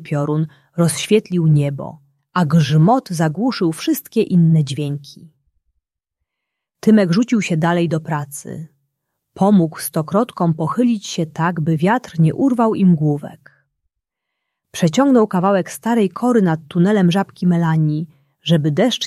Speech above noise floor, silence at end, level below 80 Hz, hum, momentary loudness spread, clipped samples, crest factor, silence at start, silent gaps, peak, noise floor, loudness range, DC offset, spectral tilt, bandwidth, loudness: 64 dB; 0 s; -60 dBFS; none; 11 LU; under 0.1%; 16 dB; 0 s; none; -2 dBFS; -80 dBFS; 3 LU; under 0.1%; -6.5 dB/octave; 14 kHz; -17 LUFS